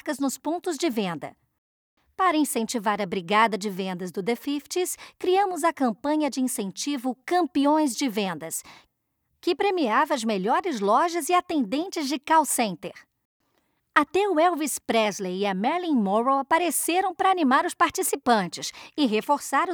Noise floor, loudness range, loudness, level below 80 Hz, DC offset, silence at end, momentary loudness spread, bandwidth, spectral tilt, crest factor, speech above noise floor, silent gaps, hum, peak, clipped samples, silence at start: -75 dBFS; 3 LU; -24 LUFS; -70 dBFS; under 0.1%; 0 s; 8 LU; over 20 kHz; -3.5 dB/octave; 20 dB; 51 dB; 1.58-1.97 s, 13.25-13.40 s; none; -4 dBFS; under 0.1%; 0.05 s